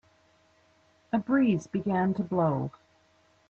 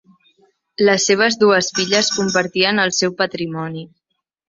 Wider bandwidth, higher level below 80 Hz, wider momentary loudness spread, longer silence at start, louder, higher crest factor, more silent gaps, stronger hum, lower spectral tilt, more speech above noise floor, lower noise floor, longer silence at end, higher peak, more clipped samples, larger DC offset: about the same, 8 kHz vs 7.8 kHz; about the same, -66 dBFS vs -62 dBFS; second, 8 LU vs 12 LU; first, 1.15 s vs 0.8 s; second, -28 LUFS vs -16 LUFS; about the same, 16 dB vs 16 dB; neither; neither; first, -8.5 dB/octave vs -3 dB/octave; second, 38 dB vs 58 dB; second, -65 dBFS vs -75 dBFS; first, 0.8 s vs 0.65 s; second, -14 dBFS vs -2 dBFS; neither; neither